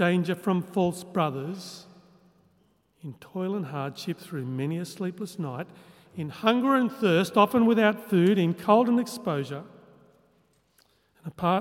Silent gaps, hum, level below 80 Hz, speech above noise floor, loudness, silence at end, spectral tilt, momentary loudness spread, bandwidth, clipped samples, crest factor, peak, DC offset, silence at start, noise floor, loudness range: none; none; -70 dBFS; 41 dB; -26 LUFS; 0 s; -6.5 dB/octave; 19 LU; 16.5 kHz; under 0.1%; 22 dB; -4 dBFS; under 0.1%; 0 s; -66 dBFS; 11 LU